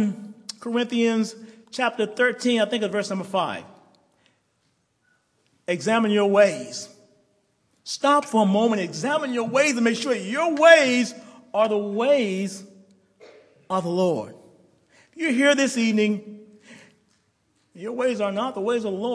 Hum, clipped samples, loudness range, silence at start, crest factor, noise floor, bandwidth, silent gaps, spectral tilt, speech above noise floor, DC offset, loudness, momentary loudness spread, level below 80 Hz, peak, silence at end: none; under 0.1%; 7 LU; 0 s; 22 dB; -69 dBFS; 11 kHz; none; -4.5 dB/octave; 48 dB; under 0.1%; -22 LUFS; 16 LU; -78 dBFS; -2 dBFS; 0 s